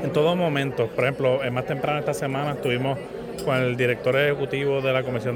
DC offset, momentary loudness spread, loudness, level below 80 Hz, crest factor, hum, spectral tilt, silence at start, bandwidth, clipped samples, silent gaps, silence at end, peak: under 0.1%; 5 LU; -24 LUFS; -54 dBFS; 14 dB; none; -6 dB/octave; 0 s; 17 kHz; under 0.1%; none; 0 s; -10 dBFS